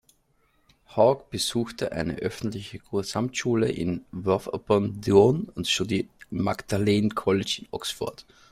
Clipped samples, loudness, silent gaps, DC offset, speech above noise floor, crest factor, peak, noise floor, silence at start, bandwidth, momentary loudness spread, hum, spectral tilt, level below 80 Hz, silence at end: under 0.1%; -26 LUFS; none; under 0.1%; 41 dB; 22 dB; -4 dBFS; -67 dBFS; 0.9 s; 15.5 kHz; 10 LU; none; -5 dB/octave; -54 dBFS; 0.3 s